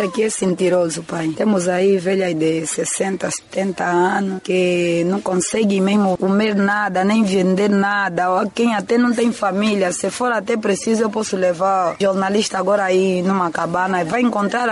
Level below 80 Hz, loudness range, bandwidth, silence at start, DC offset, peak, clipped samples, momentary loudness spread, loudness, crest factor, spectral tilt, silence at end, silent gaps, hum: -58 dBFS; 2 LU; 11.5 kHz; 0 s; under 0.1%; -6 dBFS; under 0.1%; 4 LU; -18 LUFS; 10 dB; -5 dB/octave; 0 s; none; none